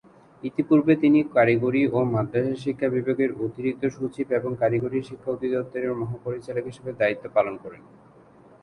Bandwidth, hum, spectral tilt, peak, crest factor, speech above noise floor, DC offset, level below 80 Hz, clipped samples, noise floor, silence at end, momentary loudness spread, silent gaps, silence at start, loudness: 10 kHz; none; -8.5 dB/octave; -6 dBFS; 18 dB; 28 dB; under 0.1%; -60 dBFS; under 0.1%; -52 dBFS; 0.85 s; 12 LU; none; 0.45 s; -24 LUFS